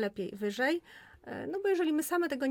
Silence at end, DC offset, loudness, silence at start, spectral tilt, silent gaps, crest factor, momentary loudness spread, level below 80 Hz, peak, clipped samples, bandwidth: 0 s; under 0.1%; -32 LUFS; 0 s; -4.5 dB/octave; none; 14 dB; 12 LU; -70 dBFS; -20 dBFS; under 0.1%; 19 kHz